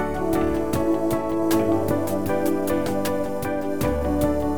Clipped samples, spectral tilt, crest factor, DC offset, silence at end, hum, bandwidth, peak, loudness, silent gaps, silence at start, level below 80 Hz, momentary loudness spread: under 0.1%; -6.5 dB/octave; 14 dB; 2%; 0 s; none; over 20 kHz; -8 dBFS; -23 LUFS; none; 0 s; -38 dBFS; 4 LU